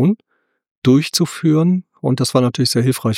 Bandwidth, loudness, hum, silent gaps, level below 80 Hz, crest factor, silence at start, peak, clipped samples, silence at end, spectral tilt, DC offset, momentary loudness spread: 16.5 kHz; -16 LUFS; none; 0.71-0.82 s; -58 dBFS; 14 dB; 0 s; -2 dBFS; under 0.1%; 0 s; -5.5 dB/octave; under 0.1%; 6 LU